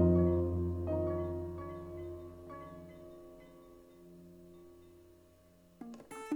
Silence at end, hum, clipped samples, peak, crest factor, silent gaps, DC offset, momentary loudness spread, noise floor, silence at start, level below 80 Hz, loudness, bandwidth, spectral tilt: 0 s; none; under 0.1%; -16 dBFS; 20 dB; none; under 0.1%; 25 LU; -63 dBFS; 0 s; -52 dBFS; -37 LUFS; 12 kHz; -9.5 dB/octave